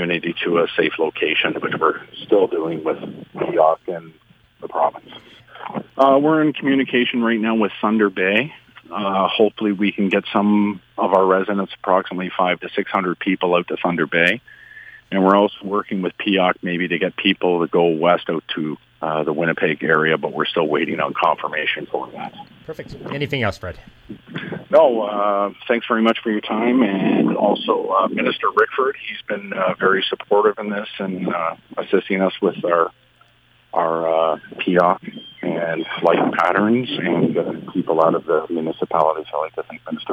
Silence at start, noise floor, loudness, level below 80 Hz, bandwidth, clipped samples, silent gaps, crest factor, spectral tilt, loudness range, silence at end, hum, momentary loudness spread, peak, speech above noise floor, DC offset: 0 s; -55 dBFS; -19 LUFS; -60 dBFS; 8.6 kHz; under 0.1%; none; 18 dB; -7.5 dB/octave; 3 LU; 0 s; none; 12 LU; -2 dBFS; 36 dB; under 0.1%